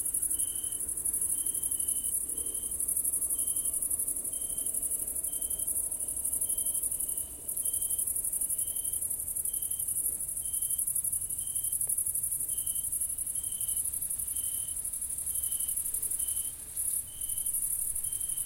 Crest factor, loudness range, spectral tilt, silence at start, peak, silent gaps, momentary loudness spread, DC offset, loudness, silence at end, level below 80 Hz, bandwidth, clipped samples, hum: 18 dB; 2 LU; -0.5 dB/octave; 0 s; -14 dBFS; none; 4 LU; under 0.1%; -30 LUFS; 0 s; -56 dBFS; 16.5 kHz; under 0.1%; none